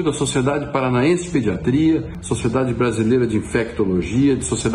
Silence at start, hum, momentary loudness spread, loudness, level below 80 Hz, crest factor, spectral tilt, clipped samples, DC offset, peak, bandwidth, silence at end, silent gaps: 0 s; none; 4 LU; -19 LUFS; -38 dBFS; 14 dB; -6 dB/octave; under 0.1%; under 0.1%; -4 dBFS; 11.5 kHz; 0 s; none